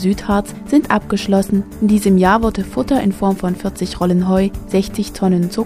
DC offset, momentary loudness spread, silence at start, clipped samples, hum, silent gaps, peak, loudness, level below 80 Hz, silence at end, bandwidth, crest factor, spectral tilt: under 0.1%; 7 LU; 0 s; under 0.1%; none; none; 0 dBFS; -16 LUFS; -34 dBFS; 0 s; 15 kHz; 16 dB; -6.5 dB/octave